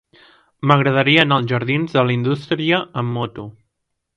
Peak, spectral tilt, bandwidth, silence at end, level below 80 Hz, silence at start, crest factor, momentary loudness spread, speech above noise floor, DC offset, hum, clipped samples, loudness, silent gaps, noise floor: 0 dBFS; -7.5 dB/octave; 7.6 kHz; 0.65 s; -56 dBFS; 0.65 s; 18 dB; 12 LU; 58 dB; under 0.1%; none; under 0.1%; -17 LUFS; none; -75 dBFS